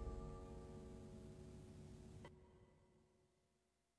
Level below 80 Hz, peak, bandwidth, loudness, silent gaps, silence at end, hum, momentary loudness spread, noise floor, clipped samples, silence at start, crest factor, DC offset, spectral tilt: -62 dBFS; -40 dBFS; 11 kHz; -58 LUFS; none; 0.7 s; none; 8 LU; -85 dBFS; under 0.1%; 0 s; 18 dB; under 0.1%; -7 dB/octave